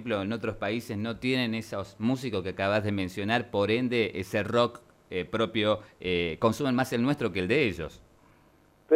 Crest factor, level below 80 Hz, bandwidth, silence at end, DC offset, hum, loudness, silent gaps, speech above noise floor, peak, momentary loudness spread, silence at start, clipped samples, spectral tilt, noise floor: 18 dB; -58 dBFS; 16 kHz; 0 s; under 0.1%; none; -29 LUFS; none; 33 dB; -10 dBFS; 7 LU; 0 s; under 0.1%; -6 dB/octave; -61 dBFS